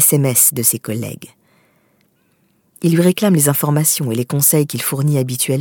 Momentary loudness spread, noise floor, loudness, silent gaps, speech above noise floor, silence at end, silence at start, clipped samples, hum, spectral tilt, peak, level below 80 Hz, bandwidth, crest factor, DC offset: 11 LU; -60 dBFS; -14 LUFS; none; 44 dB; 0 s; 0 s; under 0.1%; none; -4.5 dB/octave; 0 dBFS; -64 dBFS; 19.5 kHz; 16 dB; under 0.1%